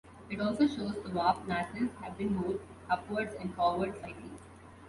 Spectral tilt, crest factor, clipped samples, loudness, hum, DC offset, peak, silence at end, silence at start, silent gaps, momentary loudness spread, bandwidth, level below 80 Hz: -6.5 dB/octave; 20 dB; under 0.1%; -33 LUFS; none; under 0.1%; -14 dBFS; 0 s; 0.05 s; none; 14 LU; 11.5 kHz; -58 dBFS